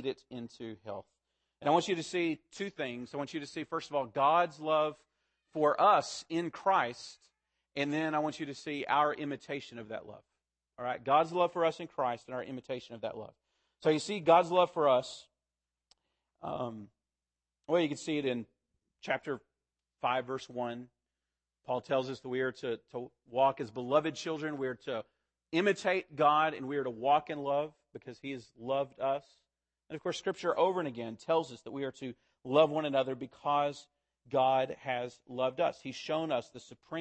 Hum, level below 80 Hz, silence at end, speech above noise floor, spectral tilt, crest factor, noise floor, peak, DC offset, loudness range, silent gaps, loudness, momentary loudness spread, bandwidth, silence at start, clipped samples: none; -78 dBFS; 0 s; over 57 dB; -5 dB/octave; 22 dB; under -90 dBFS; -10 dBFS; under 0.1%; 6 LU; none; -33 LUFS; 16 LU; 8.8 kHz; 0 s; under 0.1%